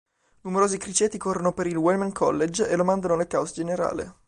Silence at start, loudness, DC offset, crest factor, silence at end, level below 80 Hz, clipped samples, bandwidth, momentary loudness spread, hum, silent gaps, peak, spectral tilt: 0.45 s; -24 LUFS; under 0.1%; 16 dB; 0.15 s; -56 dBFS; under 0.1%; 11 kHz; 5 LU; none; none; -8 dBFS; -5 dB/octave